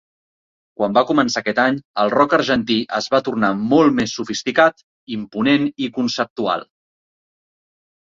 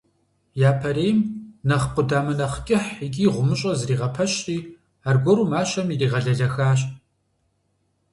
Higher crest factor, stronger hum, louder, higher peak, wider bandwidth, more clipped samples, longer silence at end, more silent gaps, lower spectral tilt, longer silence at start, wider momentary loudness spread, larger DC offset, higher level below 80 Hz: about the same, 18 dB vs 16 dB; neither; first, -18 LUFS vs -22 LUFS; first, -2 dBFS vs -6 dBFS; second, 7.6 kHz vs 11.5 kHz; neither; first, 1.4 s vs 1.15 s; first, 1.85-1.94 s, 4.83-5.07 s, 6.30-6.36 s vs none; second, -4.5 dB/octave vs -6 dB/octave; first, 0.8 s vs 0.55 s; about the same, 8 LU vs 9 LU; neither; second, -56 dBFS vs -48 dBFS